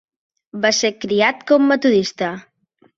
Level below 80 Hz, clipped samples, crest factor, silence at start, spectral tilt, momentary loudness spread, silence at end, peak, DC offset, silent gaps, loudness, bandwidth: -62 dBFS; under 0.1%; 18 dB; 0.55 s; -3.5 dB/octave; 11 LU; 0.55 s; -2 dBFS; under 0.1%; none; -17 LUFS; 7.8 kHz